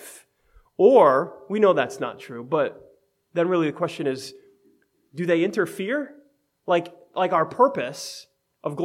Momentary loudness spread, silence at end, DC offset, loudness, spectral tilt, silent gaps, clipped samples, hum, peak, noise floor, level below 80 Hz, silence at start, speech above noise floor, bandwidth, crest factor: 20 LU; 0 s; under 0.1%; -23 LUFS; -5.5 dB/octave; none; under 0.1%; none; -4 dBFS; -62 dBFS; -70 dBFS; 0 s; 41 dB; 15 kHz; 20 dB